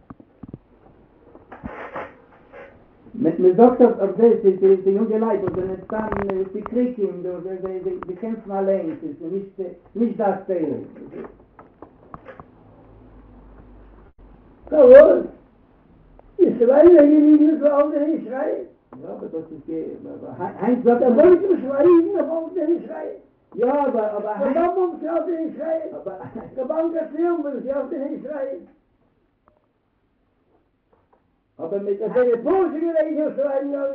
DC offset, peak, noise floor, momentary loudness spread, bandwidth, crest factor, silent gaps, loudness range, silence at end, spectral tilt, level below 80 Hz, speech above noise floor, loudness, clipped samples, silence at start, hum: under 0.1%; 0 dBFS; -66 dBFS; 20 LU; 4.2 kHz; 20 dB; none; 13 LU; 0 s; -10.5 dB/octave; -54 dBFS; 48 dB; -19 LUFS; under 0.1%; 0.55 s; none